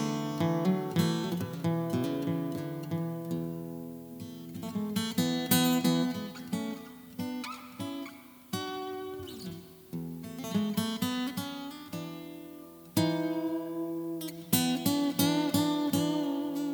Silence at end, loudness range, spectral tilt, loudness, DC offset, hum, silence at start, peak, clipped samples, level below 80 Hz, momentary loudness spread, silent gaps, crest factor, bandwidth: 0 s; 9 LU; -5 dB/octave; -32 LUFS; under 0.1%; none; 0 s; -10 dBFS; under 0.1%; -70 dBFS; 15 LU; none; 22 dB; over 20 kHz